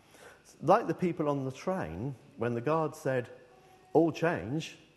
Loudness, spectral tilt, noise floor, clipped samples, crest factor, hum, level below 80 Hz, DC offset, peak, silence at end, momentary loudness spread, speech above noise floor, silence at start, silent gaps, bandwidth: -31 LUFS; -7 dB/octave; -58 dBFS; under 0.1%; 22 dB; none; -64 dBFS; under 0.1%; -10 dBFS; 0.2 s; 11 LU; 28 dB; 0.2 s; none; 12.5 kHz